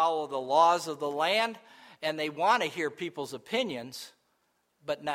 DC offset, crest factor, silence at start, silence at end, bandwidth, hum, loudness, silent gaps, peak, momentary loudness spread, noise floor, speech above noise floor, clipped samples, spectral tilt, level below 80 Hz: under 0.1%; 20 dB; 0 s; 0 s; 16 kHz; none; -29 LUFS; none; -10 dBFS; 18 LU; -74 dBFS; 45 dB; under 0.1%; -3.5 dB/octave; -80 dBFS